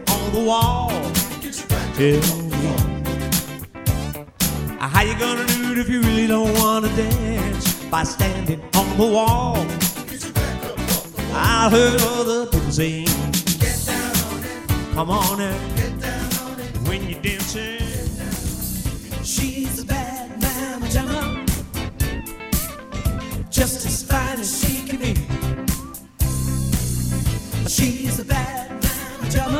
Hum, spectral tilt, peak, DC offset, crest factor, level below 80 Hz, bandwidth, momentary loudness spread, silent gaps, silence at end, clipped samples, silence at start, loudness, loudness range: none; -4.5 dB/octave; 0 dBFS; under 0.1%; 20 dB; -30 dBFS; 17 kHz; 8 LU; none; 0 s; under 0.1%; 0 s; -21 LUFS; 6 LU